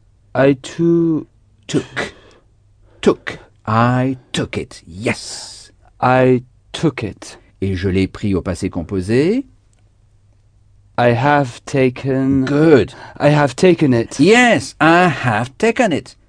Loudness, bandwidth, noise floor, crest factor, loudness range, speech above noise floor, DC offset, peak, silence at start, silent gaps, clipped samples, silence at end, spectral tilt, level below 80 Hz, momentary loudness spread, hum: -16 LUFS; 10 kHz; -52 dBFS; 16 dB; 7 LU; 37 dB; under 0.1%; 0 dBFS; 0.35 s; none; under 0.1%; 0.2 s; -6 dB/octave; -46 dBFS; 14 LU; none